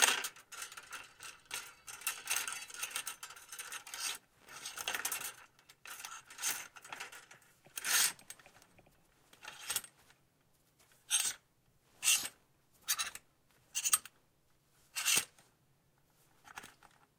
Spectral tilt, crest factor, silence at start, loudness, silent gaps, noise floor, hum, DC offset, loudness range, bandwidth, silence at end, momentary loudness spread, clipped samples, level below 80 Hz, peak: 2.5 dB/octave; 30 dB; 0 s; -36 LUFS; none; -73 dBFS; none; under 0.1%; 6 LU; 18 kHz; 0.5 s; 22 LU; under 0.1%; -80 dBFS; -10 dBFS